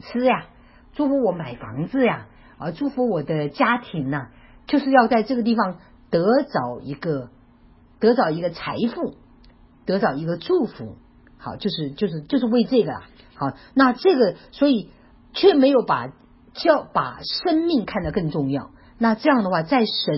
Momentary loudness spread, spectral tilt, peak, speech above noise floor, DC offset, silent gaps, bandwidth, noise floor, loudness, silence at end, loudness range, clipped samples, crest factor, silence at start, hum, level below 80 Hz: 14 LU; -10.5 dB/octave; -2 dBFS; 31 dB; under 0.1%; none; 5.8 kHz; -52 dBFS; -21 LUFS; 0 s; 5 LU; under 0.1%; 20 dB; 0.05 s; none; -52 dBFS